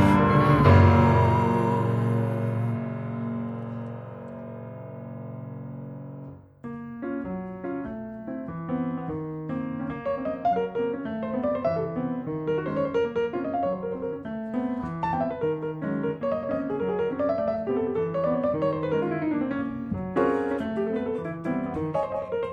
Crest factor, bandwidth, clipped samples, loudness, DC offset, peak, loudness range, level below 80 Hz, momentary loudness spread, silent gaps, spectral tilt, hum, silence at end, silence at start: 20 dB; 12 kHz; under 0.1%; -26 LUFS; under 0.1%; -6 dBFS; 11 LU; -48 dBFS; 17 LU; none; -9 dB/octave; none; 0 s; 0 s